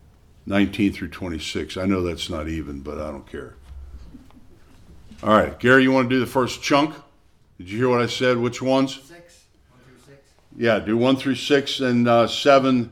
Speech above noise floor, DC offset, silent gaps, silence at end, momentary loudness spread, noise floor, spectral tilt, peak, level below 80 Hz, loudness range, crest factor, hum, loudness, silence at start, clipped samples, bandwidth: 35 dB; under 0.1%; none; 0 s; 16 LU; -55 dBFS; -5.5 dB/octave; 0 dBFS; -46 dBFS; 9 LU; 22 dB; none; -20 LUFS; 0.45 s; under 0.1%; 15 kHz